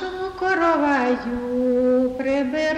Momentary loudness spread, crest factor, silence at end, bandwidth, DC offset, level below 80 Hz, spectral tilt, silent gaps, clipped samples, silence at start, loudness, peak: 7 LU; 12 dB; 0 s; 9.4 kHz; under 0.1%; -48 dBFS; -5.5 dB/octave; none; under 0.1%; 0 s; -21 LUFS; -8 dBFS